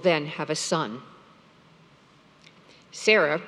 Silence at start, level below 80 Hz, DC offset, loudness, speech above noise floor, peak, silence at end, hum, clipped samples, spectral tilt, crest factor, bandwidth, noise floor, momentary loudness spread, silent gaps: 0 s; -76 dBFS; under 0.1%; -24 LUFS; 32 dB; -6 dBFS; 0 s; none; under 0.1%; -3.5 dB/octave; 22 dB; 12.5 kHz; -56 dBFS; 19 LU; none